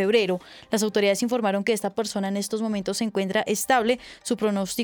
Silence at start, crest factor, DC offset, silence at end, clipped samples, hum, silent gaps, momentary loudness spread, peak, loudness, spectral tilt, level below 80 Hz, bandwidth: 0 s; 16 dB; under 0.1%; 0 s; under 0.1%; none; none; 6 LU; -10 dBFS; -25 LUFS; -4 dB/octave; -64 dBFS; over 20 kHz